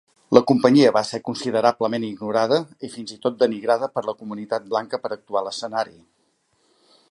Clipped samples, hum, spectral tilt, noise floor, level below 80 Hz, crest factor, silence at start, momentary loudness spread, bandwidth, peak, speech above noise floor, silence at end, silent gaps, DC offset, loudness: under 0.1%; none; -5.5 dB/octave; -66 dBFS; -68 dBFS; 22 dB; 0.3 s; 13 LU; 11.5 kHz; 0 dBFS; 46 dB; 1.25 s; none; under 0.1%; -21 LUFS